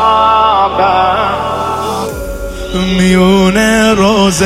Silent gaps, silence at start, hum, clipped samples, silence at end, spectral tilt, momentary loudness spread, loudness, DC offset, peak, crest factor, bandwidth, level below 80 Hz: none; 0 s; none; under 0.1%; 0 s; -5 dB/octave; 11 LU; -10 LUFS; under 0.1%; 0 dBFS; 10 dB; 15.5 kHz; -28 dBFS